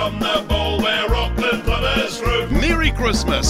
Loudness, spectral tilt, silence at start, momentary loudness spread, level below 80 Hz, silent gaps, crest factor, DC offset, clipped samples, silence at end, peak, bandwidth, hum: -19 LUFS; -4.5 dB/octave; 0 s; 2 LU; -24 dBFS; none; 16 dB; under 0.1%; under 0.1%; 0 s; -2 dBFS; 16 kHz; none